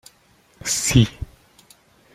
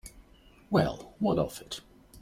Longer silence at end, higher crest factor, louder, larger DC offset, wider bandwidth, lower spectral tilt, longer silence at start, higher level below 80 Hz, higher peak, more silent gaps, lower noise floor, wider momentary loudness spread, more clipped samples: first, 0.9 s vs 0 s; about the same, 20 dB vs 22 dB; first, -20 LUFS vs -31 LUFS; neither; about the same, 16 kHz vs 16.5 kHz; second, -4 dB/octave vs -6.5 dB/octave; first, 0.65 s vs 0.05 s; first, -40 dBFS vs -54 dBFS; first, -2 dBFS vs -10 dBFS; neither; about the same, -57 dBFS vs -57 dBFS; first, 21 LU vs 14 LU; neither